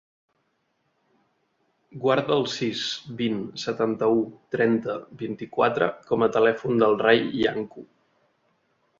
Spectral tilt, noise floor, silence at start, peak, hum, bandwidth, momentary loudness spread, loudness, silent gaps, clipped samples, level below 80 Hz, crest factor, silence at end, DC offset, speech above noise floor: -5.5 dB/octave; -72 dBFS; 1.95 s; -4 dBFS; none; 7.6 kHz; 11 LU; -24 LUFS; none; under 0.1%; -64 dBFS; 22 dB; 1.15 s; under 0.1%; 48 dB